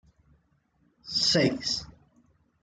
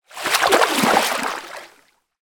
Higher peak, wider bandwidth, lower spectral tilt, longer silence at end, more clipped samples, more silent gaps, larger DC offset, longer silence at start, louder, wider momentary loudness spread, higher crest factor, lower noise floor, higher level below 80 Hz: second, -12 dBFS vs -2 dBFS; second, 11.5 kHz vs 19.5 kHz; first, -3.5 dB/octave vs -2 dB/octave; first, 0.75 s vs 0.55 s; neither; neither; neither; first, 1.05 s vs 0.15 s; second, -26 LUFS vs -17 LUFS; second, 10 LU vs 18 LU; about the same, 20 dB vs 20 dB; first, -69 dBFS vs -57 dBFS; about the same, -60 dBFS vs -60 dBFS